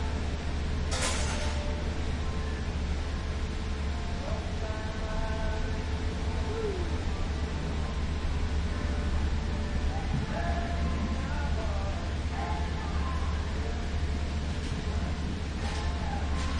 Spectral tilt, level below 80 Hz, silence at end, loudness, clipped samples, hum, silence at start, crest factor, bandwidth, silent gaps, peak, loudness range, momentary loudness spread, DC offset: -5.5 dB/octave; -34 dBFS; 0 s; -33 LUFS; under 0.1%; none; 0 s; 16 dB; 11 kHz; none; -14 dBFS; 2 LU; 3 LU; under 0.1%